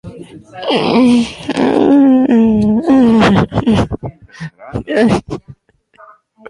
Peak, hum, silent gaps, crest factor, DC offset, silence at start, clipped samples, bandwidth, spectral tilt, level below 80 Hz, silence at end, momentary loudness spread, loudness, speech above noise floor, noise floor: 0 dBFS; none; none; 12 dB; under 0.1%; 0.05 s; under 0.1%; 11 kHz; -7 dB/octave; -36 dBFS; 0 s; 20 LU; -11 LUFS; 36 dB; -47 dBFS